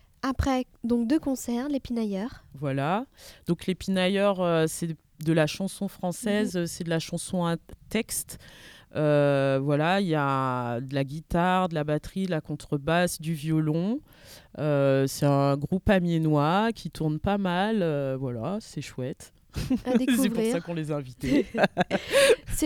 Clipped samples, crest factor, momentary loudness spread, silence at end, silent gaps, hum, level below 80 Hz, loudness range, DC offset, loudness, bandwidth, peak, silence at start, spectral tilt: under 0.1%; 20 dB; 10 LU; 0 s; none; none; -46 dBFS; 4 LU; under 0.1%; -27 LUFS; 18 kHz; -8 dBFS; 0.25 s; -5.5 dB/octave